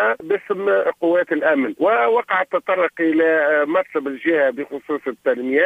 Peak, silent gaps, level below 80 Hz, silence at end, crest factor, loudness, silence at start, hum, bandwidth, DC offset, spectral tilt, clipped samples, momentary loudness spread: -4 dBFS; none; -70 dBFS; 0 s; 14 dB; -19 LUFS; 0 s; none; 8.2 kHz; under 0.1%; -6.5 dB/octave; under 0.1%; 7 LU